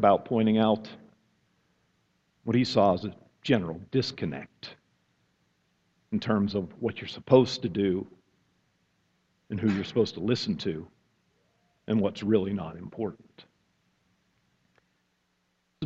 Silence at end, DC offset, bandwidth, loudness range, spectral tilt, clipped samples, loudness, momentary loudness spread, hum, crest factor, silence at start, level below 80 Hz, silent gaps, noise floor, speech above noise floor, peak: 0 s; under 0.1%; 7.8 kHz; 5 LU; -7 dB/octave; under 0.1%; -28 LUFS; 17 LU; none; 24 dB; 0 s; -64 dBFS; none; -74 dBFS; 47 dB; -6 dBFS